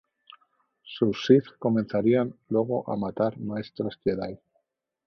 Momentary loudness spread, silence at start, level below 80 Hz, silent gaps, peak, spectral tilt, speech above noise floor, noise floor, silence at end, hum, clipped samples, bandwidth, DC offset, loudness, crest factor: 12 LU; 0.3 s; -62 dBFS; none; -6 dBFS; -8 dB/octave; 50 dB; -76 dBFS; 0.7 s; none; under 0.1%; 6.6 kHz; under 0.1%; -26 LUFS; 22 dB